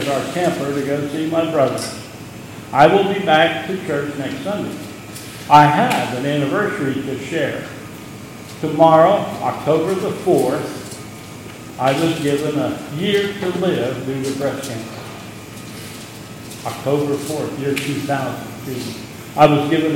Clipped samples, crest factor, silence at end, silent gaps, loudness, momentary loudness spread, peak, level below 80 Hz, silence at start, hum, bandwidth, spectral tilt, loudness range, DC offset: under 0.1%; 18 dB; 0 s; none; -18 LUFS; 20 LU; 0 dBFS; -54 dBFS; 0 s; none; 16.5 kHz; -5.5 dB/octave; 7 LU; under 0.1%